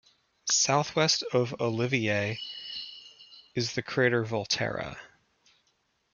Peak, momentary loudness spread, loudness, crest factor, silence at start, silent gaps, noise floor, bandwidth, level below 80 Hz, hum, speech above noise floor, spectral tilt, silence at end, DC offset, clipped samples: -10 dBFS; 14 LU; -28 LUFS; 20 dB; 0.45 s; none; -73 dBFS; 10.5 kHz; -66 dBFS; none; 45 dB; -3 dB/octave; 1.05 s; under 0.1%; under 0.1%